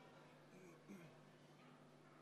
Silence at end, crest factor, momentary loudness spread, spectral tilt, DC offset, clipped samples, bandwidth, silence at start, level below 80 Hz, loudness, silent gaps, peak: 0 s; 18 dB; 5 LU; -5.5 dB/octave; under 0.1%; under 0.1%; 13 kHz; 0 s; under -90 dBFS; -64 LUFS; none; -46 dBFS